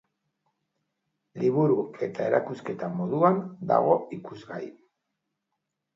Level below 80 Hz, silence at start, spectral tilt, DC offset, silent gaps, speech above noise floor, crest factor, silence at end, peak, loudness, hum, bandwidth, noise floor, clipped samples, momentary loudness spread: -76 dBFS; 1.35 s; -9 dB/octave; under 0.1%; none; 57 dB; 22 dB; 1.25 s; -8 dBFS; -26 LUFS; none; 7.6 kHz; -82 dBFS; under 0.1%; 16 LU